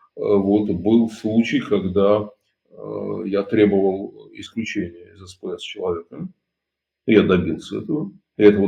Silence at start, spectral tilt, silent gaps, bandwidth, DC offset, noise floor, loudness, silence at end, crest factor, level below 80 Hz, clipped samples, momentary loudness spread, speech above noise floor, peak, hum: 0.15 s; -7.5 dB/octave; none; 9.2 kHz; under 0.1%; -82 dBFS; -20 LUFS; 0 s; 20 dB; -60 dBFS; under 0.1%; 18 LU; 63 dB; 0 dBFS; none